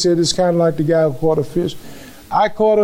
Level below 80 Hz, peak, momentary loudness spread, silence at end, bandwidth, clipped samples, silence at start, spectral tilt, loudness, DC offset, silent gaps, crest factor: -44 dBFS; -4 dBFS; 9 LU; 0 s; 16 kHz; under 0.1%; 0 s; -5.5 dB/octave; -17 LUFS; under 0.1%; none; 12 dB